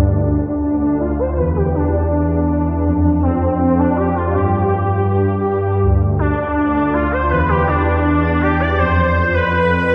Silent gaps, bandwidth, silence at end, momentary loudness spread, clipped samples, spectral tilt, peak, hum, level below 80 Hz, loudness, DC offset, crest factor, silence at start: none; 5 kHz; 0 s; 3 LU; under 0.1%; -10.5 dB/octave; -2 dBFS; none; -24 dBFS; -16 LUFS; under 0.1%; 12 dB; 0 s